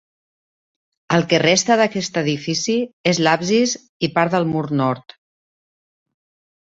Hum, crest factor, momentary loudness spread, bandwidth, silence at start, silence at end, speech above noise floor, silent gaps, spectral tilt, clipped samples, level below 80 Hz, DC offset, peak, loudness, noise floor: none; 20 dB; 7 LU; 8 kHz; 1.1 s; 1.75 s; over 72 dB; 2.93-3.04 s, 3.89-4.00 s; -4 dB/octave; under 0.1%; -60 dBFS; under 0.1%; 0 dBFS; -18 LUFS; under -90 dBFS